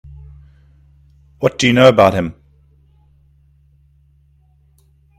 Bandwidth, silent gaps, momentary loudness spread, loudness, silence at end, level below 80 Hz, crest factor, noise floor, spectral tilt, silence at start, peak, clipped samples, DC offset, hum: 14.5 kHz; none; 13 LU; -13 LUFS; 2.9 s; -46 dBFS; 18 dB; -53 dBFS; -5.5 dB/octave; 1.4 s; 0 dBFS; under 0.1%; under 0.1%; none